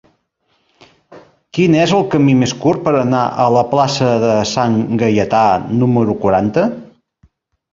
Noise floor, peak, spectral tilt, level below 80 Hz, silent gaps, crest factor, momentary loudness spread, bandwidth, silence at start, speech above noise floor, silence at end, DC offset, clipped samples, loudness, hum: -63 dBFS; -2 dBFS; -6.5 dB/octave; -48 dBFS; none; 14 dB; 4 LU; 7.8 kHz; 1.1 s; 50 dB; 0.85 s; under 0.1%; under 0.1%; -14 LUFS; none